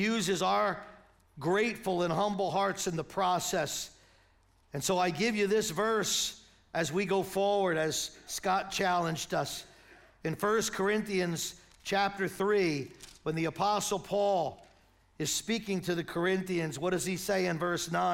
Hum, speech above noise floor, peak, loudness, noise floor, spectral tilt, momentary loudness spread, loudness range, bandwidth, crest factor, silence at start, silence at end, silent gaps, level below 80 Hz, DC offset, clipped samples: none; 35 dB; -16 dBFS; -31 LUFS; -66 dBFS; -4 dB/octave; 9 LU; 2 LU; 16.5 kHz; 16 dB; 0 s; 0 s; none; -62 dBFS; under 0.1%; under 0.1%